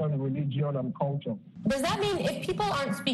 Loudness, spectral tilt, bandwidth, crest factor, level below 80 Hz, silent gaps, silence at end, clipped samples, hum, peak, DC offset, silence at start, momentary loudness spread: -30 LUFS; -6 dB/octave; 12.5 kHz; 16 dB; -56 dBFS; none; 0 s; under 0.1%; none; -14 dBFS; under 0.1%; 0 s; 4 LU